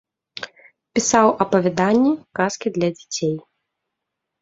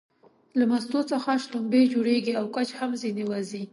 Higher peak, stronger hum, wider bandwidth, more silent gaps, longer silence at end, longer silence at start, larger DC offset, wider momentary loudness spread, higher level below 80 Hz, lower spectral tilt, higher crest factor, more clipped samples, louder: first, 0 dBFS vs -10 dBFS; neither; second, 8 kHz vs 11.5 kHz; neither; first, 1 s vs 0.05 s; second, 0.35 s vs 0.55 s; neither; first, 18 LU vs 8 LU; first, -60 dBFS vs -76 dBFS; about the same, -4.5 dB/octave vs -5.5 dB/octave; about the same, 20 dB vs 16 dB; neither; first, -19 LUFS vs -26 LUFS